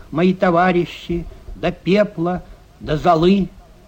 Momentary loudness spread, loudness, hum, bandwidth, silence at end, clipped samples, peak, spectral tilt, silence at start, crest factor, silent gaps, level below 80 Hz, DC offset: 13 LU; -18 LUFS; none; 8.4 kHz; 0.3 s; under 0.1%; -4 dBFS; -7.5 dB/octave; 0 s; 14 dB; none; -38 dBFS; under 0.1%